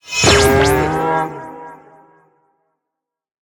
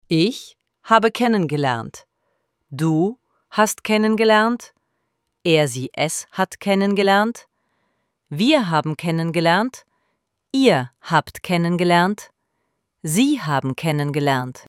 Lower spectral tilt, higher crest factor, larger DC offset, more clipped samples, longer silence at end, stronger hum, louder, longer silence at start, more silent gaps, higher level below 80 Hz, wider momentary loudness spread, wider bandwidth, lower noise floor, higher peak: second, -3.5 dB/octave vs -5 dB/octave; about the same, 18 dB vs 20 dB; neither; neither; first, 1.8 s vs 0.1 s; neither; first, -14 LUFS vs -19 LUFS; about the same, 0.05 s vs 0.1 s; neither; first, -34 dBFS vs -64 dBFS; first, 22 LU vs 10 LU; first, 19.5 kHz vs 16.5 kHz; first, -81 dBFS vs -73 dBFS; about the same, 0 dBFS vs 0 dBFS